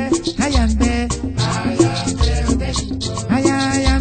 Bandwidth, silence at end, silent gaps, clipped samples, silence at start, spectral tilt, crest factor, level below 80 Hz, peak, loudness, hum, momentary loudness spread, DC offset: 9.2 kHz; 0 s; none; under 0.1%; 0 s; -5 dB/octave; 16 dB; -22 dBFS; 0 dBFS; -18 LUFS; none; 6 LU; under 0.1%